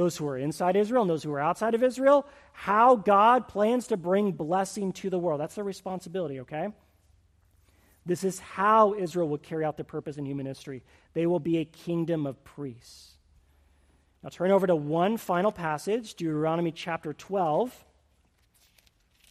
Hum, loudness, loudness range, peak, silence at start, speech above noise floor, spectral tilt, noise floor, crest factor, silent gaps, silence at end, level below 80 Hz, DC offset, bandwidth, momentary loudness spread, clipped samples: none; -27 LUFS; 9 LU; -8 dBFS; 0 s; 40 dB; -6 dB/octave; -67 dBFS; 20 dB; none; 1.55 s; -66 dBFS; under 0.1%; 15 kHz; 15 LU; under 0.1%